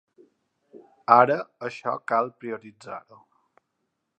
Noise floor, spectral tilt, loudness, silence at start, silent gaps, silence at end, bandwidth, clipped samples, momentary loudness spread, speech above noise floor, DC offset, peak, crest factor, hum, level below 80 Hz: -78 dBFS; -6.5 dB/octave; -23 LUFS; 0.75 s; none; 1.2 s; 8.8 kHz; under 0.1%; 22 LU; 54 dB; under 0.1%; 0 dBFS; 26 dB; none; -78 dBFS